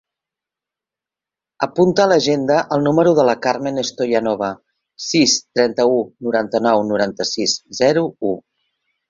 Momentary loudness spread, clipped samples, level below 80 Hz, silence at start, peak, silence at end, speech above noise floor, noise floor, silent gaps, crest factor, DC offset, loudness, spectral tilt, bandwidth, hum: 9 LU; under 0.1%; -58 dBFS; 1.6 s; 0 dBFS; 0.7 s; 71 dB; -88 dBFS; none; 18 dB; under 0.1%; -17 LUFS; -4 dB/octave; 7.6 kHz; none